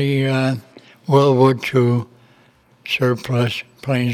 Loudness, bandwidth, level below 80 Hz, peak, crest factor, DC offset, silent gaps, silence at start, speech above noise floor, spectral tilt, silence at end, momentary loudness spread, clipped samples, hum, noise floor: -18 LUFS; 14 kHz; -60 dBFS; -2 dBFS; 18 dB; under 0.1%; none; 0 s; 37 dB; -7 dB/octave; 0 s; 14 LU; under 0.1%; none; -53 dBFS